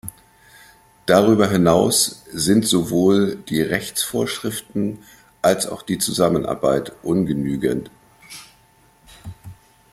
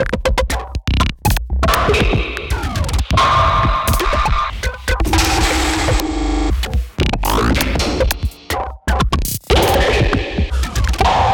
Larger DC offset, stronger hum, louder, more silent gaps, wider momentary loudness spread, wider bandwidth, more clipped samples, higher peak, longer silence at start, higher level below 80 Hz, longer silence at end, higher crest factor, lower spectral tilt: neither; neither; about the same, -19 LUFS vs -17 LUFS; neither; first, 22 LU vs 8 LU; about the same, 16 kHz vs 17.5 kHz; neither; about the same, -2 dBFS vs 0 dBFS; about the same, 0.05 s vs 0 s; second, -50 dBFS vs -20 dBFS; first, 0.4 s vs 0 s; first, 20 dB vs 14 dB; about the same, -4.5 dB/octave vs -4.5 dB/octave